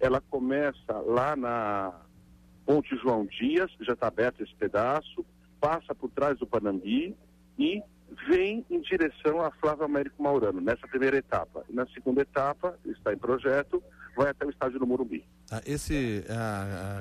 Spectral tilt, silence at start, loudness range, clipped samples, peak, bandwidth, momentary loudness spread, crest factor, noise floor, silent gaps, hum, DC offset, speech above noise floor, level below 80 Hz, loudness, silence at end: -6.5 dB/octave; 0 s; 2 LU; under 0.1%; -14 dBFS; 14.5 kHz; 9 LU; 16 dB; -56 dBFS; none; none; under 0.1%; 27 dB; -54 dBFS; -29 LUFS; 0 s